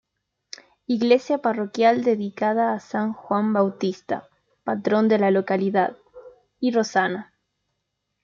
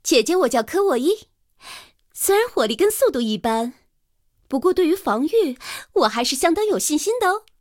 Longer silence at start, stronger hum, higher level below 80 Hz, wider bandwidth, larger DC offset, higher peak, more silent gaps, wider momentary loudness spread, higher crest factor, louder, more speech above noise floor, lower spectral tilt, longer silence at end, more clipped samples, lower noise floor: first, 0.9 s vs 0.05 s; neither; second, -70 dBFS vs -56 dBFS; second, 7.4 kHz vs 17.5 kHz; neither; about the same, -6 dBFS vs -4 dBFS; neither; about the same, 12 LU vs 11 LU; about the same, 18 dB vs 18 dB; about the same, -22 LUFS vs -20 LUFS; first, 56 dB vs 46 dB; first, -6 dB/octave vs -2.5 dB/octave; first, 1 s vs 0.2 s; neither; first, -78 dBFS vs -66 dBFS